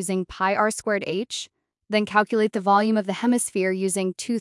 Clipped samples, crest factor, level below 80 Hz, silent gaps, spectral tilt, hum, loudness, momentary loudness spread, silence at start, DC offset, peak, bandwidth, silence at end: under 0.1%; 18 dB; -60 dBFS; none; -4 dB/octave; none; -23 LUFS; 8 LU; 0 s; under 0.1%; -6 dBFS; 12 kHz; 0 s